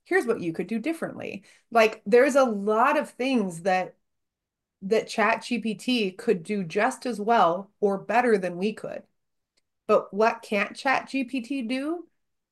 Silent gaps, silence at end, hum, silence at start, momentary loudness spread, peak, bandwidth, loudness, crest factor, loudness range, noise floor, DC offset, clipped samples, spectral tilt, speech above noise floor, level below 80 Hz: none; 0.5 s; none; 0.1 s; 12 LU; -6 dBFS; 12.5 kHz; -25 LUFS; 20 dB; 4 LU; -86 dBFS; under 0.1%; under 0.1%; -5 dB/octave; 61 dB; -76 dBFS